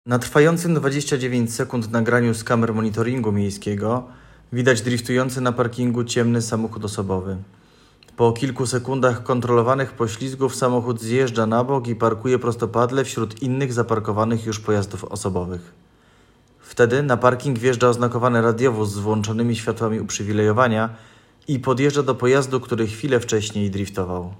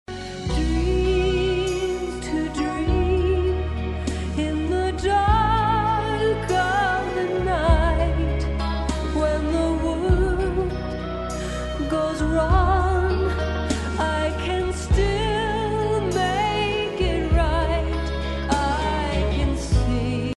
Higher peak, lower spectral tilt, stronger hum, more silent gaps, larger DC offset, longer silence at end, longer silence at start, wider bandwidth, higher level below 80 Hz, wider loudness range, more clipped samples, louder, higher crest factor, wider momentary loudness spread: first, 0 dBFS vs -6 dBFS; about the same, -6 dB/octave vs -6 dB/octave; neither; neither; neither; about the same, 0 s vs 0.05 s; about the same, 0.05 s vs 0.1 s; first, 16.5 kHz vs 11.5 kHz; second, -56 dBFS vs -26 dBFS; about the same, 3 LU vs 2 LU; neither; about the same, -21 LUFS vs -23 LUFS; about the same, 20 dB vs 16 dB; about the same, 7 LU vs 7 LU